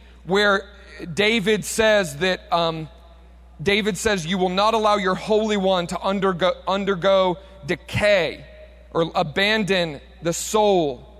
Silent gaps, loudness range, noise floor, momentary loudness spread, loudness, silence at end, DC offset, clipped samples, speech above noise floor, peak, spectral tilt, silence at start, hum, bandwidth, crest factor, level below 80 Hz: none; 1 LU; -46 dBFS; 10 LU; -21 LUFS; 0 s; under 0.1%; under 0.1%; 25 dB; -6 dBFS; -4 dB/octave; 0.25 s; none; 16 kHz; 16 dB; -46 dBFS